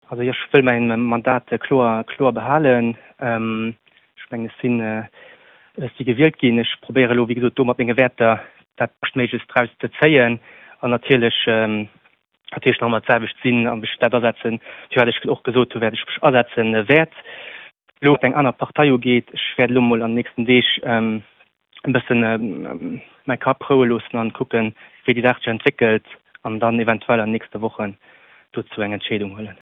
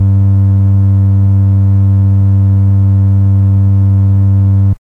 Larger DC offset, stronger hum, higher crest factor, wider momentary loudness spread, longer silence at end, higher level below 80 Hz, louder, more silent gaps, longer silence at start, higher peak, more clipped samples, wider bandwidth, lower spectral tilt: second, under 0.1% vs 0.2%; neither; first, 20 dB vs 4 dB; first, 14 LU vs 0 LU; about the same, 0.15 s vs 0.1 s; second, -60 dBFS vs -38 dBFS; second, -19 LUFS vs -9 LUFS; neither; about the same, 0.1 s vs 0 s; first, 0 dBFS vs -4 dBFS; neither; first, 4 kHz vs 1.5 kHz; second, -9 dB/octave vs -12 dB/octave